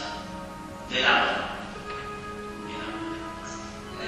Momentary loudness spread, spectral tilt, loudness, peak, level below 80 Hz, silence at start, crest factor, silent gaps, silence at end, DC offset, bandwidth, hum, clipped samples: 17 LU; -3.5 dB/octave; -29 LUFS; -8 dBFS; -50 dBFS; 0 s; 22 dB; none; 0 s; under 0.1%; 15 kHz; none; under 0.1%